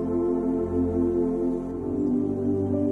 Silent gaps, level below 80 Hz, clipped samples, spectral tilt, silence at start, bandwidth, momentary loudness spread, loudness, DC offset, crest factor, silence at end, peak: none; -46 dBFS; under 0.1%; -11 dB/octave; 0 s; 2.7 kHz; 3 LU; -26 LUFS; under 0.1%; 12 dB; 0 s; -14 dBFS